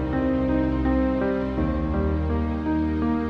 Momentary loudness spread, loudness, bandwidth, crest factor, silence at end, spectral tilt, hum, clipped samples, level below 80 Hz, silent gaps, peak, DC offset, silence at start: 3 LU; -24 LUFS; 5.8 kHz; 12 dB; 0 s; -10 dB/octave; none; under 0.1%; -30 dBFS; none; -12 dBFS; under 0.1%; 0 s